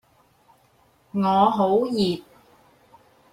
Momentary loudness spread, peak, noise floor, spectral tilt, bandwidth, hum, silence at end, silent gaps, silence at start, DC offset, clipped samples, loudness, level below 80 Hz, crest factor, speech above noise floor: 11 LU; -6 dBFS; -60 dBFS; -7 dB/octave; 14 kHz; none; 1.15 s; none; 1.15 s; under 0.1%; under 0.1%; -22 LUFS; -62 dBFS; 18 dB; 40 dB